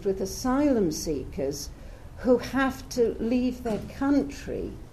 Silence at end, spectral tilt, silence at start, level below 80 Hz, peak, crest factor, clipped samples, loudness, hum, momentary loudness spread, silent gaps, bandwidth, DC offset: 0.05 s; -5.5 dB/octave; 0 s; -44 dBFS; -10 dBFS; 18 dB; under 0.1%; -27 LUFS; none; 11 LU; none; 14 kHz; 0.2%